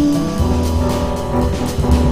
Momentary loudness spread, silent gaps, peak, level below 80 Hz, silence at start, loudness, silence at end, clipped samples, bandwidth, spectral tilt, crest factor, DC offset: 3 LU; none; -2 dBFS; -22 dBFS; 0 s; -17 LUFS; 0 s; under 0.1%; 16 kHz; -7 dB/octave; 14 dB; 3%